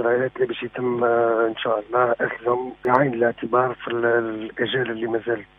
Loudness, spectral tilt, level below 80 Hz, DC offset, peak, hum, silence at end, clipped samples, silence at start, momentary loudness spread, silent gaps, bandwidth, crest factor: -22 LUFS; -8.5 dB/octave; -60 dBFS; under 0.1%; -2 dBFS; none; 0.15 s; under 0.1%; 0 s; 6 LU; none; 3.9 kHz; 20 dB